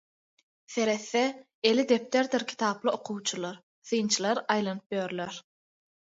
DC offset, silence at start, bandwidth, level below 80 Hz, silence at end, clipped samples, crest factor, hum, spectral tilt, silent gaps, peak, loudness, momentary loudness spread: under 0.1%; 0.7 s; 8 kHz; -78 dBFS; 0.7 s; under 0.1%; 20 dB; none; -3.5 dB/octave; 1.54-1.62 s, 3.63-3.82 s, 4.86-4.90 s; -10 dBFS; -29 LUFS; 11 LU